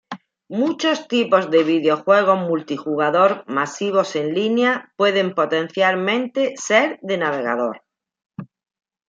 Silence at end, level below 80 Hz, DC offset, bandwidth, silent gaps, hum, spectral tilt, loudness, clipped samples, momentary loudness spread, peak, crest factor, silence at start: 0.65 s; -72 dBFS; under 0.1%; 7.8 kHz; 8.26-8.30 s; none; -4.5 dB/octave; -19 LUFS; under 0.1%; 9 LU; -2 dBFS; 18 dB; 0.1 s